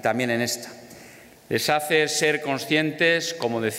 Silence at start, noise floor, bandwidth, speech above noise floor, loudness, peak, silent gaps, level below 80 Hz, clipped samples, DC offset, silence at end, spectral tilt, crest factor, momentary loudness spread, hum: 0 s; -47 dBFS; 16 kHz; 24 dB; -23 LUFS; -8 dBFS; none; -68 dBFS; under 0.1%; under 0.1%; 0 s; -3.5 dB/octave; 16 dB; 9 LU; none